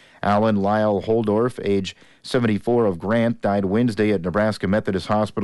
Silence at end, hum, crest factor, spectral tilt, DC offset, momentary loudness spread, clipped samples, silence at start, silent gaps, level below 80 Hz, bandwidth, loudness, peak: 0 s; none; 12 dB; -7 dB/octave; under 0.1%; 4 LU; under 0.1%; 0.25 s; none; -54 dBFS; 11.5 kHz; -21 LUFS; -10 dBFS